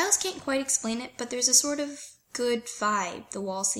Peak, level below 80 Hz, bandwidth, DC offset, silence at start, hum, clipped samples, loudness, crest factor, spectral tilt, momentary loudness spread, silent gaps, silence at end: -6 dBFS; -68 dBFS; 16.5 kHz; under 0.1%; 0 s; none; under 0.1%; -26 LUFS; 22 dB; -1 dB/octave; 15 LU; none; 0 s